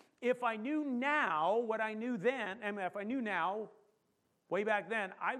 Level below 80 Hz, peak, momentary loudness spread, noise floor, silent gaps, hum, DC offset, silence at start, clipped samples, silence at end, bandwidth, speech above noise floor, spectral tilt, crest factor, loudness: -90 dBFS; -18 dBFS; 7 LU; -79 dBFS; none; none; under 0.1%; 0.2 s; under 0.1%; 0 s; 11 kHz; 43 dB; -5.5 dB/octave; 18 dB; -36 LUFS